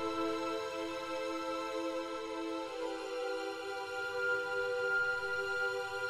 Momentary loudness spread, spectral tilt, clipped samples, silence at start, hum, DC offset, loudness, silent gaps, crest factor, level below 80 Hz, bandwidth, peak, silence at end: 7 LU; -3 dB/octave; under 0.1%; 0 s; none; under 0.1%; -37 LUFS; none; 14 dB; -70 dBFS; 15 kHz; -24 dBFS; 0 s